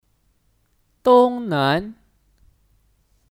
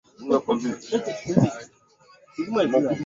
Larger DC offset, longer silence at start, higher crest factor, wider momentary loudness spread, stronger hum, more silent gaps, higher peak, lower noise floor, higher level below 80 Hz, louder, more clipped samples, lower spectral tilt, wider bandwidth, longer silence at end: neither; first, 1.05 s vs 0.2 s; about the same, 18 dB vs 22 dB; about the same, 10 LU vs 11 LU; neither; neither; about the same, -4 dBFS vs -2 dBFS; first, -64 dBFS vs -56 dBFS; about the same, -56 dBFS vs -60 dBFS; first, -18 LUFS vs -24 LUFS; neither; about the same, -7 dB/octave vs -6.5 dB/octave; first, 15.5 kHz vs 7.8 kHz; first, 1.45 s vs 0 s